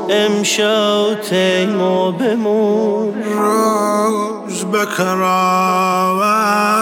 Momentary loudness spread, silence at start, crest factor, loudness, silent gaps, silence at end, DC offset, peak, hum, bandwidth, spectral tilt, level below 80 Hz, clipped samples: 4 LU; 0 s; 12 dB; -15 LUFS; none; 0 s; under 0.1%; -4 dBFS; none; 17.5 kHz; -4 dB/octave; -68 dBFS; under 0.1%